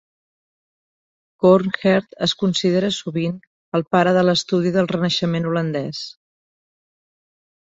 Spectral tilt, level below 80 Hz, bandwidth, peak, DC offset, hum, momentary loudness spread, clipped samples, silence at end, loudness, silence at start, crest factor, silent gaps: -5.5 dB/octave; -60 dBFS; 8 kHz; -2 dBFS; under 0.1%; none; 10 LU; under 0.1%; 1.55 s; -19 LUFS; 1.4 s; 18 dB; 3.47-3.72 s